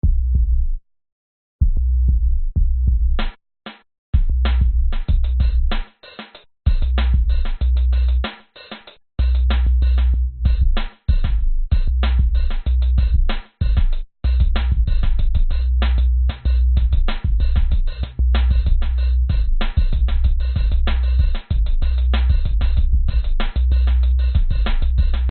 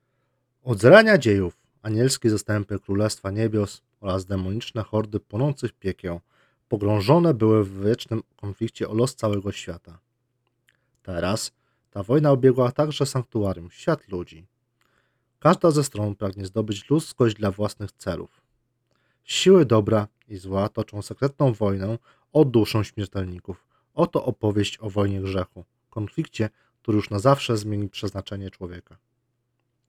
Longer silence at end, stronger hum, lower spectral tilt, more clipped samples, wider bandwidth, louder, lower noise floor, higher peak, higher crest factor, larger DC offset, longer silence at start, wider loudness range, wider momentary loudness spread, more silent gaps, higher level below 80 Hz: second, 0 s vs 1.1 s; neither; about the same, -6 dB/octave vs -6 dB/octave; neither; second, 4.4 kHz vs 15 kHz; first, -20 LUFS vs -23 LUFS; second, -40 dBFS vs -74 dBFS; second, -4 dBFS vs 0 dBFS; second, 12 dB vs 24 dB; neither; second, 0.05 s vs 0.65 s; second, 2 LU vs 5 LU; second, 8 LU vs 16 LU; first, 1.12-1.59 s, 3.98-4.13 s vs none; first, -16 dBFS vs -56 dBFS